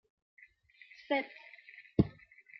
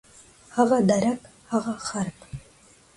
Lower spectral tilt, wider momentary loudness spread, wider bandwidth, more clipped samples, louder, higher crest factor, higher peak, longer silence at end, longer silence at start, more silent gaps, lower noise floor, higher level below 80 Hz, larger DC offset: about the same, -6 dB/octave vs -5.5 dB/octave; about the same, 21 LU vs 21 LU; second, 6 kHz vs 11.5 kHz; neither; second, -35 LUFS vs -25 LUFS; first, 28 dB vs 20 dB; second, -12 dBFS vs -6 dBFS; about the same, 0.5 s vs 0.55 s; first, 1.1 s vs 0.55 s; neither; first, -61 dBFS vs -55 dBFS; about the same, -56 dBFS vs -56 dBFS; neither